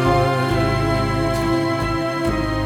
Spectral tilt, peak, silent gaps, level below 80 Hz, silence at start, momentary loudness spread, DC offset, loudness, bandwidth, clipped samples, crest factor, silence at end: -6.5 dB/octave; -6 dBFS; none; -32 dBFS; 0 s; 3 LU; under 0.1%; -20 LUFS; 17.5 kHz; under 0.1%; 14 dB; 0 s